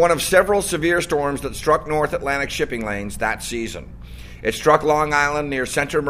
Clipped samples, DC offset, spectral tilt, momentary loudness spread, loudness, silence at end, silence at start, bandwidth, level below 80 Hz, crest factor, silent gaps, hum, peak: under 0.1%; under 0.1%; -4 dB/octave; 11 LU; -20 LUFS; 0 s; 0 s; 15.5 kHz; -38 dBFS; 20 dB; none; none; 0 dBFS